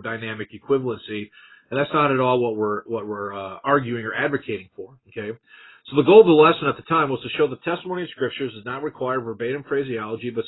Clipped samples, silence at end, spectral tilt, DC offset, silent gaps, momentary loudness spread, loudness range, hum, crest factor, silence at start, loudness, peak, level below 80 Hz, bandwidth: under 0.1%; 0 s; -11 dB/octave; under 0.1%; none; 18 LU; 8 LU; none; 22 dB; 0 s; -21 LUFS; 0 dBFS; -62 dBFS; 4.1 kHz